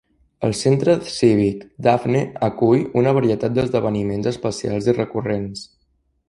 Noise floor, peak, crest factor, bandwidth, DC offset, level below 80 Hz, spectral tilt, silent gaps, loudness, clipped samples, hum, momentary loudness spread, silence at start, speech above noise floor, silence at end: -66 dBFS; -2 dBFS; 18 dB; 11.5 kHz; under 0.1%; -50 dBFS; -6.5 dB/octave; none; -19 LUFS; under 0.1%; none; 8 LU; 0.4 s; 47 dB; 0.65 s